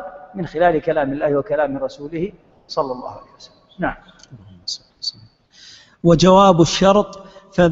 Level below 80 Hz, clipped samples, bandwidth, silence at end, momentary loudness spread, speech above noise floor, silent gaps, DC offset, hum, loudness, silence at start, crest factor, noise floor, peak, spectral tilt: -42 dBFS; under 0.1%; 8 kHz; 0 s; 19 LU; 31 dB; none; under 0.1%; none; -18 LUFS; 0 s; 18 dB; -48 dBFS; 0 dBFS; -5.5 dB/octave